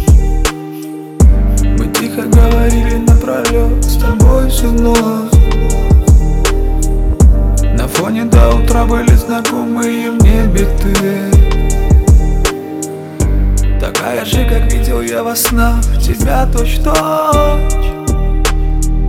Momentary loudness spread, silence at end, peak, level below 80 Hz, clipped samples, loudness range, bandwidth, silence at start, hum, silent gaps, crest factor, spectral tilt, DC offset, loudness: 6 LU; 0 s; 0 dBFS; -12 dBFS; 0.3%; 2 LU; 16.5 kHz; 0 s; none; none; 10 dB; -5.5 dB/octave; under 0.1%; -12 LUFS